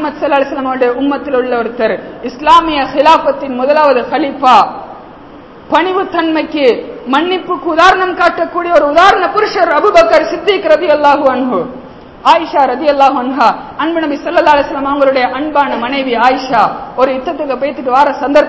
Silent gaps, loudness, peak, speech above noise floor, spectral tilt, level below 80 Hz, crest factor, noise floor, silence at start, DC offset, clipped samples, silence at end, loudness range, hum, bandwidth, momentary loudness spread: none; -11 LUFS; 0 dBFS; 23 dB; -4.5 dB/octave; -44 dBFS; 10 dB; -33 dBFS; 0 s; 0.1%; 2%; 0 s; 3 LU; none; 8 kHz; 8 LU